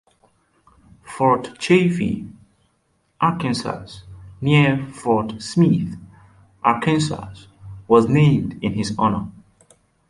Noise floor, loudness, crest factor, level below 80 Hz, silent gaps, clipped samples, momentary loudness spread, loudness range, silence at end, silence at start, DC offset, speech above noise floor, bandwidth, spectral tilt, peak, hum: -66 dBFS; -19 LUFS; 18 dB; -50 dBFS; none; under 0.1%; 22 LU; 3 LU; 0.8 s; 1.05 s; under 0.1%; 47 dB; 11.5 kHz; -6.5 dB/octave; -2 dBFS; none